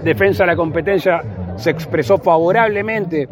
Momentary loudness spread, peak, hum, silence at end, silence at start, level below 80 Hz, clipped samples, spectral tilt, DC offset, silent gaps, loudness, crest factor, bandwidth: 7 LU; 0 dBFS; none; 0.05 s; 0 s; -46 dBFS; under 0.1%; -7 dB/octave; under 0.1%; none; -16 LUFS; 14 dB; 16.5 kHz